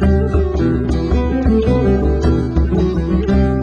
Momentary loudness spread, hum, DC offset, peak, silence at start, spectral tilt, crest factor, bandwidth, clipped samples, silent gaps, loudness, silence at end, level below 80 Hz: 3 LU; none; under 0.1%; -2 dBFS; 0 s; -9 dB/octave; 12 dB; 7.2 kHz; under 0.1%; none; -16 LUFS; 0 s; -18 dBFS